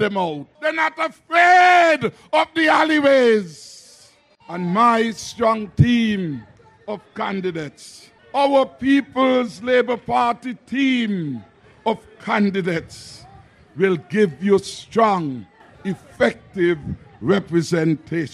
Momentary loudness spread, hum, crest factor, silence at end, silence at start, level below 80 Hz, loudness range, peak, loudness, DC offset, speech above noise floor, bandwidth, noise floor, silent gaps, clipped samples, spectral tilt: 17 LU; none; 18 dB; 0.05 s; 0 s; -50 dBFS; 7 LU; 0 dBFS; -19 LUFS; under 0.1%; 33 dB; 12.5 kHz; -52 dBFS; none; under 0.1%; -6 dB/octave